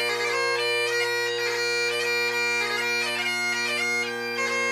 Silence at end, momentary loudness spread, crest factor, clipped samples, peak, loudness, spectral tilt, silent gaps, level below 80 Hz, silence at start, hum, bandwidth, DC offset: 0 s; 2 LU; 12 dB; under 0.1%; -14 dBFS; -24 LUFS; -1 dB/octave; none; -78 dBFS; 0 s; none; 15.5 kHz; under 0.1%